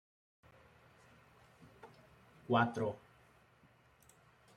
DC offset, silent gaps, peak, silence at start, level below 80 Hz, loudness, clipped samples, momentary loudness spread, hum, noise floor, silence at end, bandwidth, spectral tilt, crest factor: under 0.1%; none; -18 dBFS; 1.85 s; -76 dBFS; -35 LUFS; under 0.1%; 27 LU; none; -68 dBFS; 1.6 s; 13.5 kHz; -7 dB/octave; 26 dB